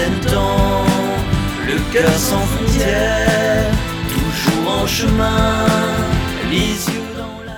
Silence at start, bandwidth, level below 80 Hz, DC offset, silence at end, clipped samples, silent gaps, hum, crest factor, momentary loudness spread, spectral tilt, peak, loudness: 0 s; 19.5 kHz; -24 dBFS; under 0.1%; 0 s; under 0.1%; none; none; 14 dB; 5 LU; -5 dB/octave; -2 dBFS; -16 LUFS